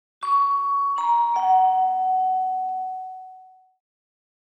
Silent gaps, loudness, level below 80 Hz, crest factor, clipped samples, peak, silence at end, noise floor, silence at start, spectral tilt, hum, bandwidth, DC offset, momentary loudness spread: none; -21 LUFS; under -90 dBFS; 14 dB; under 0.1%; -10 dBFS; 1.1 s; -48 dBFS; 0.2 s; -1.5 dB/octave; none; 9 kHz; under 0.1%; 13 LU